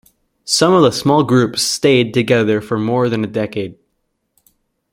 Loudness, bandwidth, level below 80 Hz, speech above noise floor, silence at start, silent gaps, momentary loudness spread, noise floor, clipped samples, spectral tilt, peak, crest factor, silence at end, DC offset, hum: -15 LUFS; 16.5 kHz; -54 dBFS; 55 dB; 0.45 s; none; 10 LU; -69 dBFS; under 0.1%; -4.5 dB/octave; -2 dBFS; 14 dB; 1.2 s; under 0.1%; none